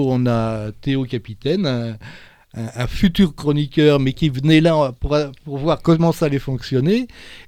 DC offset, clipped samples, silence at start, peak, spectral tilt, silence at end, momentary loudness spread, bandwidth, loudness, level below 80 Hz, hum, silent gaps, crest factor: under 0.1%; under 0.1%; 0 s; -2 dBFS; -7.5 dB/octave; 0.05 s; 12 LU; 15.5 kHz; -18 LUFS; -36 dBFS; none; none; 16 dB